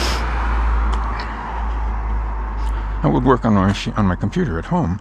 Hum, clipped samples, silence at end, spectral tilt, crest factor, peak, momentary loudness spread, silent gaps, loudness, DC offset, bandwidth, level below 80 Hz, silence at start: none; under 0.1%; 0 s; -6.5 dB/octave; 18 dB; 0 dBFS; 10 LU; none; -20 LUFS; under 0.1%; 9.6 kHz; -22 dBFS; 0 s